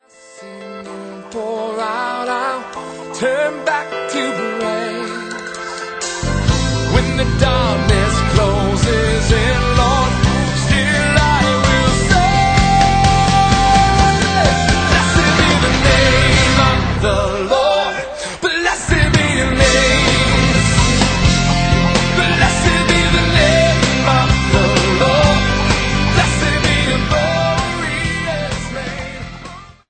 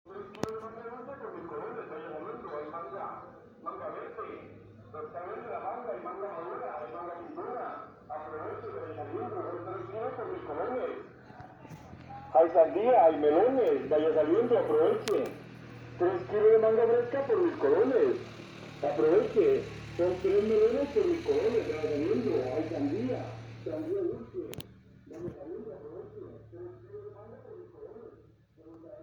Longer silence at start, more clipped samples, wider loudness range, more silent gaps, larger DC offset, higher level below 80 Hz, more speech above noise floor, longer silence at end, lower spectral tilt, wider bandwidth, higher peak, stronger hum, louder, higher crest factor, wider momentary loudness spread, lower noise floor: first, 0.35 s vs 0.05 s; neither; second, 8 LU vs 15 LU; neither; neither; first, -22 dBFS vs -62 dBFS; second, 21 dB vs 32 dB; first, 0.25 s vs 0 s; second, -4.5 dB/octave vs -7 dB/octave; second, 9.2 kHz vs 18.5 kHz; first, 0 dBFS vs -12 dBFS; neither; first, -14 LUFS vs -30 LUFS; about the same, 14 dB vs 18 dB; second, 13 LU vs 22 LU; second, -38 dBFS vs -59 dBFS